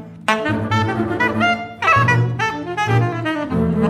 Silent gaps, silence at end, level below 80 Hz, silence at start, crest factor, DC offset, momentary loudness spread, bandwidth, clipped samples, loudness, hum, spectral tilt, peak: none; 0 s; -44 dBFS; 0 s; 16 dB; under 0.1%; 7 LU; 11 kHz; under 0.1%; -18 LUFS; none; -6.5 dB/octave; -2 dBFS